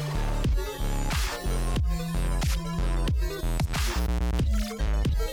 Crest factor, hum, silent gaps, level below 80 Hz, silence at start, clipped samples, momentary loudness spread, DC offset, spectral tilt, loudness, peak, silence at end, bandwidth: 10 dB; none; none; -28 dBFS; 0 s; under 0.1%; 3 LU; under 0.1%; -5 dB/octave; -29 LUFS; -16 dBFS; 0 s; 18 kHz